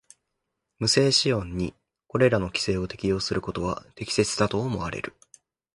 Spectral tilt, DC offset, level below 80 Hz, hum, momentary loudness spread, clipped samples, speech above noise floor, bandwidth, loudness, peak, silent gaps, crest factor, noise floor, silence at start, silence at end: -4.5 dB/octave; under 0.1%; -48 dBFS; none; 12 LU; under 0.1%; 56 dB; 11.5 kHz; -25 LUFS; -6 dBFS; none; 22 dB; -81 dBFS; 0.8 s; 0.65 s